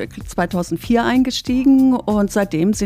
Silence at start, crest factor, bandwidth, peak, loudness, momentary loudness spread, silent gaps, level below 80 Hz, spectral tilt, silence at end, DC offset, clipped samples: 0 s; 12 dB; 15.5 kHz; -4 dBFS; -17 LUFS; 9 LU; none; -38 dBFS; -5.5 dB/octave; 0 s; under 0.1%; under 0.1%